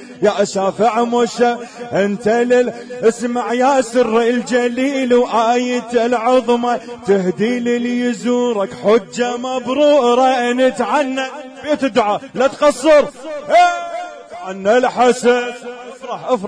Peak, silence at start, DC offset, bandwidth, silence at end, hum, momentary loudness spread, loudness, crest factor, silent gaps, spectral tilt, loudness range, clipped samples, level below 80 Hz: -2 dBFS; 0 s; under 0.1%; 10.5 kHz; 0 s; none; 11 LU; -15 LUFS; 12 dB; none; -4.5 dB/octave; 2 LU; under 0.1%; -56 dBFS